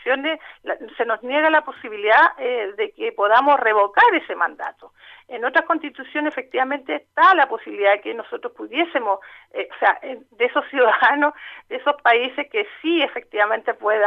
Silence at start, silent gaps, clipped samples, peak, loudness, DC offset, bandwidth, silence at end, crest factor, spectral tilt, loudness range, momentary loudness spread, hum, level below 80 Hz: 0.05 s; none; under 0.1%; -4 dBFS; -19 LUFS; under 0.1%; 6.4 kHz; 0 s; 16 dB; -4 dB/octave; 4 LU; 15 LU; none; -70 dBFS